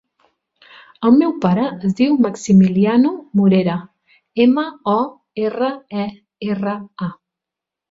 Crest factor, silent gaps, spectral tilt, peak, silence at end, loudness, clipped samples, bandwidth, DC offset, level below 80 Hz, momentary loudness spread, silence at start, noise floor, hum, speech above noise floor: 16 dB; none; -7.5 dB/octave; -2 dBFS; 0.75 s; -17 LUFS; under 0.1%; 7.8 kHz; under 0.1%; -58 dBFS; 14 LU; 1 s; -85 dBFS; none; 69 dB